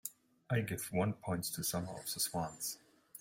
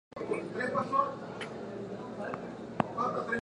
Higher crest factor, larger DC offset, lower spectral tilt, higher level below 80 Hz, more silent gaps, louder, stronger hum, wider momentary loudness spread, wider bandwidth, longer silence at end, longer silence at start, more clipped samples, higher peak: second, 18 dB vs 28 dB; neither; second, -4 dB/octave vs -6.5 dB/octave; about the same, -68 dBFS vs -66 dBFS; neither; second, -38 LUFS vs -35 LUFS; neither; second, 8 LU vs 11 LU; first, 16.5 kHz vs 11 kHz; about the same, 0 s vs 0 s; about the same, 0.05 s vs 0.15 s; neither; second, -22 dBFS vs -8 dBFS